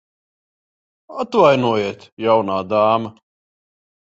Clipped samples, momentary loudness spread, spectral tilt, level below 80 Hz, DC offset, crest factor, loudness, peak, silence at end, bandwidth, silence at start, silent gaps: under 0.1%; 14 LU; -6.5 dB/octave; -60 dBFS; under 0.1%; 18 dB; -17 LUFS; -2 dBFS; 1.05 s; 7.8 kHz; 1.1 s; 2.12-2.17 s